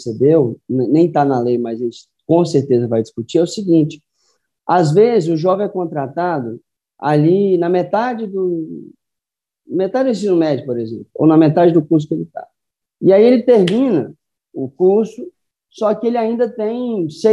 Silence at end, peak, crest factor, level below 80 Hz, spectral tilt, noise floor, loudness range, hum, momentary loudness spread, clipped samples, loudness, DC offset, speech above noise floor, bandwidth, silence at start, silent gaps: 0 s; 0 dBFS; 14 dB; -66 dBFS; -8 dB/octave; -85 dBFS; 4 LU; none; 14 LU; under 0.1%; -15 LUFS; under 0.1%; 70 dB; 10.5 kHz; 0 s; none